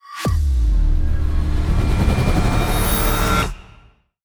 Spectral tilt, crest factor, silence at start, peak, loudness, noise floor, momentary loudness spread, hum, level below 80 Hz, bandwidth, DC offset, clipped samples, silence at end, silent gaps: -5.5 dB/octave; 12 dB; 0.1 s; -4 dBFS; -20 LUFS; -50 dBFS; 4 LU; none; -18 dBFS; over 20 kHz; under 0.1%; under 0.1%; 0.65 s; none